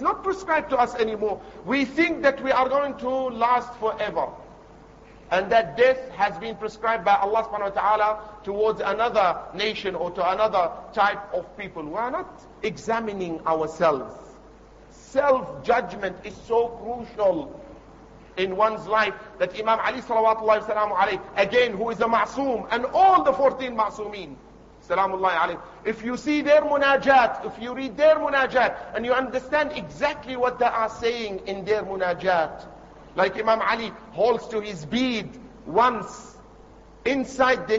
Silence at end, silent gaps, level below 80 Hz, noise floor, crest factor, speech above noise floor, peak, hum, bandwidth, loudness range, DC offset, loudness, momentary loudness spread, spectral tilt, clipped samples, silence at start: 0 s; none; -54 dBFS; -48 dBFS; 18 dB; 25 dB; -6 dBFS; none; 8 kHz; 5 LU; under 0.1%; -23 LUFS; 12 LU; -5 dB/octave; under 0.1%; 0 s